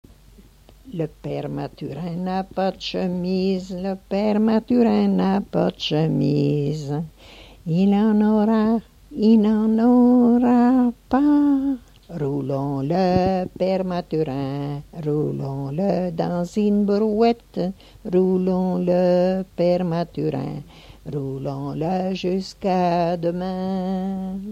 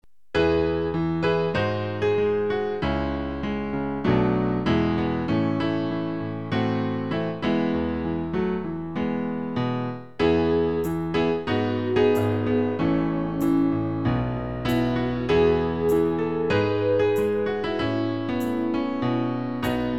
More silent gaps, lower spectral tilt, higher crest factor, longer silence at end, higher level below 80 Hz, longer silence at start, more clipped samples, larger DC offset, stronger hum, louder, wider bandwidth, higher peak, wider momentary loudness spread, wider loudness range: neither; about the same, -8.5 dB/octave vs -8 dB/octave; about the same, 16 dB vs 16 dB; about the same, 0 s vs 0 s; second, -50 dBFS vs -44 dBFS; about the same, 0.4 s vs 0.35 s; neither; second, under 0.1% vs 0.5%; neither; first, -21 LUFS vs -24 LUFS; second, 8.4 kHz vs 14 kHz; about the same, -6 dBFS vs -8 dBFS; first, 12 LU vs 6 LU; first, 7 LU vs 3 LU